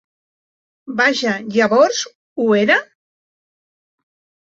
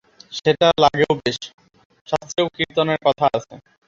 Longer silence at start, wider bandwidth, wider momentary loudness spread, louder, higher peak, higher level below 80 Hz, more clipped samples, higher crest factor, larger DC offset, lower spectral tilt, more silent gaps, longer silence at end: first, 0.85 s vs 0.3 s; about the same, 8 kHz vs 7.8 kHz; about the same, 10 LU vs 12 LU; first, -16 LUFS vs -19 LUFS; about the same, -2 dBFS vs -2 dBFS; second, -66 dBFS vs -54 dBFS; neither; about the same, 18 dB vs 18 dB; neither; about the same, -3.5 dB/octave vs -4.5 dB/octave; first, 2.15-2.36 s vs 1.54-1.58 s, 1.85-1.90 s, 2.01-2.05 s; first, 1.65 s vs 0.3 s